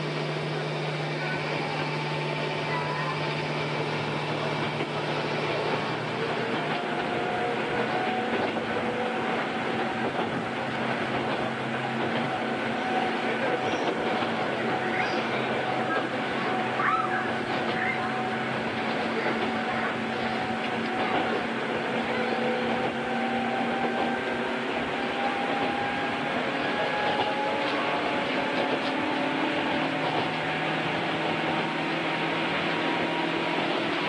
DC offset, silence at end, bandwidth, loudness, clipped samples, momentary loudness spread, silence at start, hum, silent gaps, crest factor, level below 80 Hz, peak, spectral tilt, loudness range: under 0.1%; 0 s; 10.5 kHz; -28 LUFS; under 0.1%; 3 LU; 0 s; none; none; 16 dB; -64 dBFS; -12 dBFS; -5.5 dB/octave; 2 LU